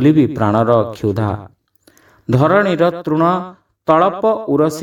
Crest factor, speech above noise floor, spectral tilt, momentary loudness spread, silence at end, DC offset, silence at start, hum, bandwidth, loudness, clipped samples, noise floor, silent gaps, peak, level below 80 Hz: 16 dB; 39 dB; -8 dB/octave; 9 LU; 0 s; under 0.1%; 0 s; none; 15 kHz; -15 LUFS; under 0.1%; -53 dBFS; none; 0 dBFS; -50 dBFS